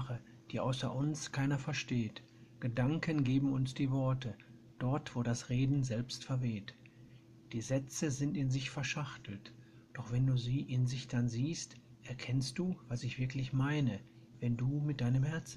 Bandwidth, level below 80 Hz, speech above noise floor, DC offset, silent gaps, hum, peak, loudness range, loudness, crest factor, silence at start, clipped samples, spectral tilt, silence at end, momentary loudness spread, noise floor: 11 kHz; -60 dBFS; 23 dB; under 0.1%; none; none; -20 dBFS; 3 LU; -37 LUFS; 18 dB; 0 s; under 0.1%; -6 dB/octave; 0 s; 12 LU; -58 dBFS